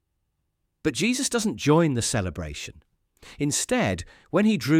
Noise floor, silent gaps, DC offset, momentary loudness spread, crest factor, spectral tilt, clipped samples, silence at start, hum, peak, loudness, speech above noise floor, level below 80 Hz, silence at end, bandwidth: -76 dBFS; none; under 0.1%; 13 LU; 18 dB; -4.5 dB/octave; under 0.1%; 0.85 s; none; -6 dBFS; -25 LUFS; 52 dB; -50 dBFS; 0 s; 16 kHz